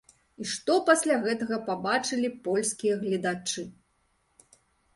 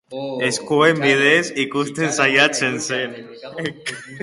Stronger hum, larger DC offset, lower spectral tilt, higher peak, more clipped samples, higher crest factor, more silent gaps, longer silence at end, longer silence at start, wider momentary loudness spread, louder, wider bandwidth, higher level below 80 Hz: neither; neither; about the same, -3.5 dB/octave vs -3.5 dB/octave; second, -6 dBFS vs 0 dBFS; neither; about the same, 22 dB vs 18 dB; neither; first, 1.25 s vs 0 s; first, 0.4 s vs 0.1 s; second, 11 LU vs 15 LU; second, -27 LUFS vs -18 LUFS; about the same, 12 kHz vs 11.5 kHz; second, -70 dBFS vs -64 dBFS